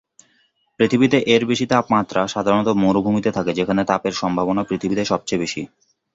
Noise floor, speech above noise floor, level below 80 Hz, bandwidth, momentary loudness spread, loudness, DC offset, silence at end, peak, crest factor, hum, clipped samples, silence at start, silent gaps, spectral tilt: -63 dBFS; 44 dB; -52 dBFS; 8 kHz; 6 LU; -19 LUFS; under 0.1%; 0.5 s; -2 dBFS; 18 dB; none; under 0.1%; 0.8 s; none; -5.5 dB/octave